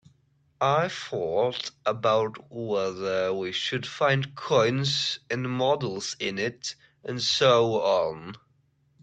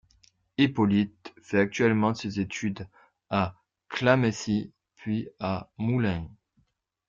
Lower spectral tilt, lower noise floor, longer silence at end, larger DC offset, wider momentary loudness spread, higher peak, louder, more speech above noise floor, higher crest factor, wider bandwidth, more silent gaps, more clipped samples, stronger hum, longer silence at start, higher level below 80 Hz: second, -4.5 dB/octave vs -6.5 dB/octave; second, -67 dBFS vs -71 dBFS; about the same, 0.65 s vs 0.75 s; neither; second, 10 LU vs 15 LU; about the same, -6 dBFS vs -8 dBFS; about the same, -26 LUFS vs -27 LUFS; second, 41 dB vs 45 dB; about the same, 20 dB vs 20 dB; first, 9 kHz vs 7.6 kHz; neither; neither; neither; about the same, 0.6 s vs 0.6 s; second, -66 dBFS vs -60 dBFS